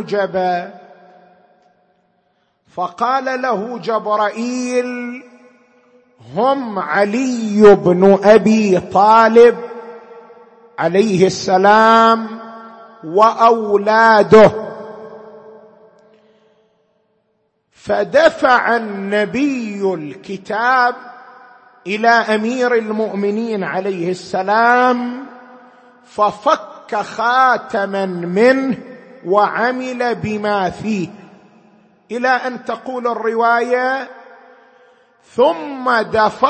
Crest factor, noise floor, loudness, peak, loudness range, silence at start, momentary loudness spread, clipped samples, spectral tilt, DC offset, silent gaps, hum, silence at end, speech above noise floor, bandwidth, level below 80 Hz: 16 dB; -65 dBFS; -14 LUFS; 0 dBFS; 9 LU; 0 s; 19 LU; under 0.1%; -5.5 dB/octave; under 0.1%; none; none; 0 s; 51 dB; 8.8 kHz; -56 dBFS